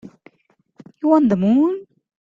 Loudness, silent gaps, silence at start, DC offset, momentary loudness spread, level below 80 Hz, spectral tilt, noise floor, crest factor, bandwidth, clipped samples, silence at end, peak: -17 LUFS; none; 1.05 s; under 0.1%; 9 LU; -58 dBFS; -9.5 dB/octave; -63 dBFS; 16 dB; 7.2 kHz; under 0.1%; 0.4 s; -4 dBFS